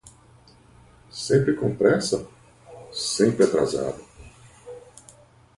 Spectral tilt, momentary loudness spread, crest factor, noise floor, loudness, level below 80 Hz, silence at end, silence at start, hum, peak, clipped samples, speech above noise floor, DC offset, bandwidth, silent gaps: -5 dB/octave; 23 LU; 20 dB; -53 dBFS; -23 LUFS; -56 dBFS; 0.8 s; 0.05 s; none; -4 dBFS; under 0.1%; 32 dB; under 0.1%; 11.5 kHz; none